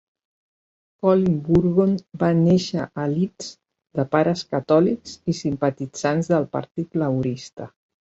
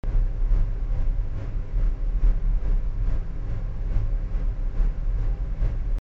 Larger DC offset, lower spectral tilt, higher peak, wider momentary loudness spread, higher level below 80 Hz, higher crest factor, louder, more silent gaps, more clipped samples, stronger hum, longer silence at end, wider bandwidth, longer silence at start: neither; second, -7 dB/octave vs -9 dB/octave; first, -4 dBFS vs -10 dBFS; first, 11 LU vs 5 LU; second, -54 dBFS vs -22 dBFS; first, 18 dB vs 12 dB; first, -22 LUFS vs -30 LUFS; first, 6.71-6.75 s, 7.53-7.57 s vs none; neither; neither; first, 0.45 s vs 0 s; first, 8 kHz vs 2.8 kHz; first, 1.05 s vs 0.05 s